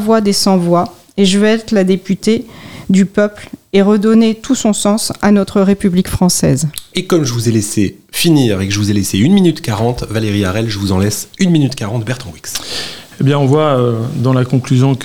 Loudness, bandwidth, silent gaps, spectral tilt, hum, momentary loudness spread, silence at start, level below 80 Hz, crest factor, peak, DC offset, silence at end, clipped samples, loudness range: -13 LUFS; 19 kHz; none; -5.5 dB/octave; none; 9 LU; 0 s; -40 dBFS; 12 dB; 0 dBFS; 1%; 0 s; under 0.1%; 3 LU